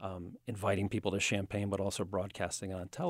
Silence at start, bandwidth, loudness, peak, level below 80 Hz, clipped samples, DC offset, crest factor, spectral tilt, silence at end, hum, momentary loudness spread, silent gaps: 0 s; 16 kHz; -36 LUFS; -16 dBFS; -62 dBFS; under 0.1%; under 0.1%; 20 dB; -4.5 dB/octave; 0 s; none; 10 LU; none